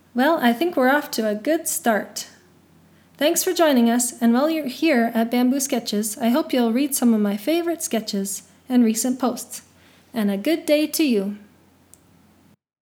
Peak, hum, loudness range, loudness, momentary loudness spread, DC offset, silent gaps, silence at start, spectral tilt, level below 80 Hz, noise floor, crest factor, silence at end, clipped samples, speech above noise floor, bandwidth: -4 dBFS; none; 4 LU; -21 LUFS; 9 LU; under 0.1%; none; 0.15 s; -3.5 dB/octave; -76 dBFS; -56 dBFS; 18 dB; 1.45 s; under 0.1%; 36 dB; 20 kHz